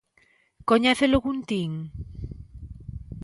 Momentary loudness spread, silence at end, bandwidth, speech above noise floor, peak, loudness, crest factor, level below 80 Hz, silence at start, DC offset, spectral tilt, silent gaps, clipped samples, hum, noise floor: 21 LU; 0 s; 11.5 kHz; 40 dB; -8 dBFS; -24 LUFS; 20 dB; -42 dBFS; 0.65 s; under 0.1%; -5.5 dB/octave; none; under 0.1%; none; -63 dBFS